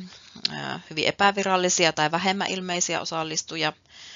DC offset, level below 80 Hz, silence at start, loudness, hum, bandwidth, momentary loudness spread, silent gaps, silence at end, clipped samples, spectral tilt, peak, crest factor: under 0.1%; -68 dBFS; 0 s; -24 LUFS; none; 7.6 kHz; 9 LU; none; 0 s; under 0.1%; -1.5 dB/octave; -4 dBFS; 22 dB